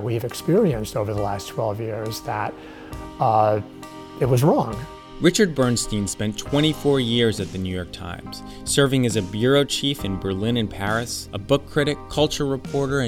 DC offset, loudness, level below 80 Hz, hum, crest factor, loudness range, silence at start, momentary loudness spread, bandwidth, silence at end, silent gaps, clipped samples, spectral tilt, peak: under 0.1%; -22 LUFS; -42 dBFS; none; 18 dB; 3 LU; 0 s; 14 LU; 18 kHz; 0 s; none; under 0.1%; -5 dB/octave; -4 dBFS